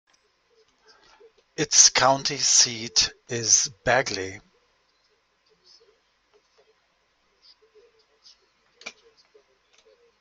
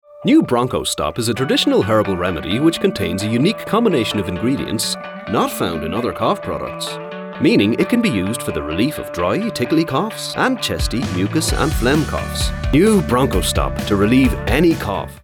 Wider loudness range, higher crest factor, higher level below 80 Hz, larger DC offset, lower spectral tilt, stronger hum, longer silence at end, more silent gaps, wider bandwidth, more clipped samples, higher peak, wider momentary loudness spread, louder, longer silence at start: first, 12 LU vs 3 LU; first, 26 dB vs 12 dB; second, -60 dBFS vs -30 dBFS; neither; second, -0.5 dB/octave vs -5 dB/octave; neither; first, 1.3 s vs 0.05 s; neither; second, 11.5 kHz vs 20 kHz; neither; first, 0 dBFS vs -4 dBFS; first, 27 LU vs 7 LU; about the same, -19 LUFS vs -18 LUFS; first, 1.6 s vs 0.1 s